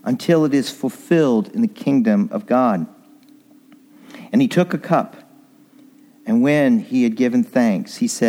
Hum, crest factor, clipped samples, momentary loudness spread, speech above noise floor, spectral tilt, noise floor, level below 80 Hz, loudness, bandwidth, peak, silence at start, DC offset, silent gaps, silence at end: none; 16 dB; under 0.1%; 7 LU; 32 dB; -6.5 dB/octave; -50 dBFS; -72 dBFS; -18 LUFS; 16 kHz; -2 dBFS; 0.05 s; under 0.1%; none; 0 s